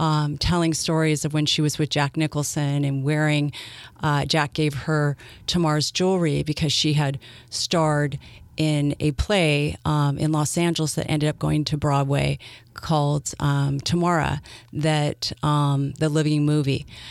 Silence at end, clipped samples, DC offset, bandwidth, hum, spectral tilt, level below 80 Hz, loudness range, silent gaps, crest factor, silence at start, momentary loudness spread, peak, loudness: 0 s; under 0.1%; under 0.1%; 13.5 kHz; none; -5 dB/octave; -42 dBFS; 1 LU; none; 16 dB; 0 s; 6 LU; -6 dBFS; -23 LUFS